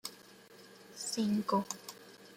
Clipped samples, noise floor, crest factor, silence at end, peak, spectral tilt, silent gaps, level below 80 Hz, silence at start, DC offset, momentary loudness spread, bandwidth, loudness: under 0.1%; -57 dBFS; 18 dB; 0 s; -20 dBFS; -4.5 dB/octave; none; -80 dBFS; 0.05 s; under 0.1%; 23 LU; 16.5 kHz; -36 LUFS